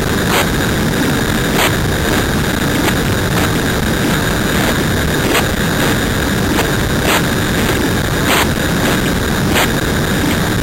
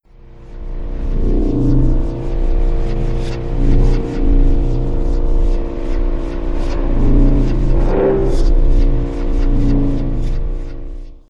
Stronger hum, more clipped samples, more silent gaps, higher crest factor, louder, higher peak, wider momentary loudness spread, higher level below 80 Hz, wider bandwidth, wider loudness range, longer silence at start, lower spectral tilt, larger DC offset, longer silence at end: neither; neither; neither; about the same, 10 dB vs 12 dB; first, -14 LUFS vs -19 LUFS; about the same, -2 dBFS vs -2 dBFS; second, 2 LU vs 10 LU; second, -26 dBFS vs -14 dBFS; first, 17 kHz vs 5.8 kHz; second, 0 LU vs 3 LU; second, 0 s vs 0.25 s; second, -4.5 dB/octave vs -9 dB/octave; neither; about the same, 0 s vs 0.1 s